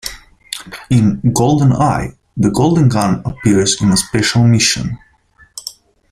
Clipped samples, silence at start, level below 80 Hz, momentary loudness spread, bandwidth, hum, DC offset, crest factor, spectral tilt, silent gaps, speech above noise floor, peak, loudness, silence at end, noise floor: under 0.1%; 0.05 s; -38 dBFS; 17 LU; 15.5 kHz; none; under 0.1%; 14 dB; -5 dB/octave; none; 37 dB; 0 dBFS; -13 LUFS; 0.4 s; -50 dBFS